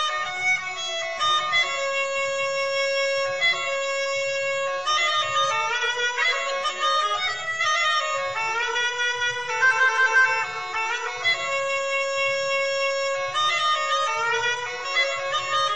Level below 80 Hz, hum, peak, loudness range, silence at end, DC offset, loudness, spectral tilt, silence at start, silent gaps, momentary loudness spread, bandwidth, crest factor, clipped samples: -64 dBFS; none; -10 dBFS; 2 LU; 0 s; 0.5%; -22 LUFS; 0.5 dB/octave; 0 s; none; 5 LU; 9.8 kHz; 14 dB; under 0.1%